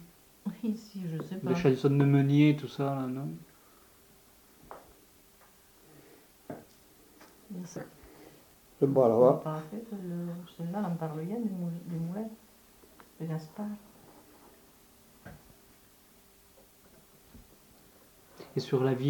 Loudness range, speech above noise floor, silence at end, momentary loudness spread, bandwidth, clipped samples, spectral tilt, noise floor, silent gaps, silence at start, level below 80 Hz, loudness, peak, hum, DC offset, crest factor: 21 LU; 31 dB; 0 s; 27 LU; 19 kHz; under 0.1%; -8 dB/octave; -60 dBFS; none; 0 s; -68 dBFS; -30 LUFS; -10 dBFS; none; under 0.1%; 22 dB